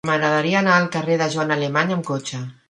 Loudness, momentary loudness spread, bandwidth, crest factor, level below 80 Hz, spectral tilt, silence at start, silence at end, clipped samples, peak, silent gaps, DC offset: -19 LUFS; 10 LU; 11 kHz; 20 dB; -64 dBFS; -5 dB/octave; 0.05 s; 0.15 s; under 0.1%; -2 dBFS; none; under 0.1%